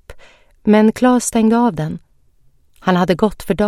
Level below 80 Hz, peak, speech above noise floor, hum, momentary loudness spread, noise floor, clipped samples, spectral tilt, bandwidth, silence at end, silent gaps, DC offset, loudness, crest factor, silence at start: -42 dBFS; 0 dBFS; 38 dB; none; 11 LU; -52 dBFS; under 0.1%; -5.5 dB/octave; 14.5 kHz; 0 s; none; under 0.1%; -15 LUFS; 16 dB; 0.1 s